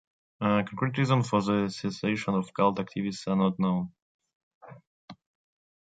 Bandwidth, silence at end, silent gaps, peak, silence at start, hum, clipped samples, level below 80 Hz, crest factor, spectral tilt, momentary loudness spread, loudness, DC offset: 9.2 kHz; 0.7 s; 4.02-4.19 s, 4.35-4.61 s, 4.87-5.08 s; -10 dBFS; 0.4 s; none; under 0.1%; -64 dBFS; 20 dB; -7 dB/octave; 7 LU; -28 LUFS; under 0.1%